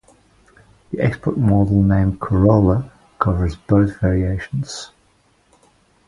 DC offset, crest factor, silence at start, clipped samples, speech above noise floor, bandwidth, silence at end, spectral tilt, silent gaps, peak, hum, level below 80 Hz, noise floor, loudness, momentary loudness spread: under 0.1%; 18 dB; 0.9 s; under 0.1%; 42 dB; 10.5 kHz; 1.2 s; -8.5 dB/octave; none; 0 dBFS; none; -32 dBFS; -58 dBFS; -18 LUFS; 14 LU